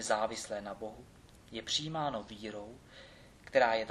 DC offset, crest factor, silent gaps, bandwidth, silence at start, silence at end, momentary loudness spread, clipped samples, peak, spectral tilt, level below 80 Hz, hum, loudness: under 0.1%; 22 dB; none; 13.5 kHz; 0 s; 0 s; 24 LU; under 0.1%; -14 dBFS; -3 dB/octave; -64 dBFS; none; -35 LUFS